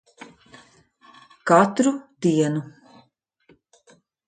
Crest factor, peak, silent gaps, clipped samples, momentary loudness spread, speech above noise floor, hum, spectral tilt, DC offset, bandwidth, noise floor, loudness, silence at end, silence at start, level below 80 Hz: 22 dB; -2 dBFS; none; under 0.1%; 20 LU; 42 dB; none; -6 dB/octave; under 0.1%; 9.6 kHz; -62 dBFS; -21 LUFS; 1.6 s; 1.45 s; -68 dBFS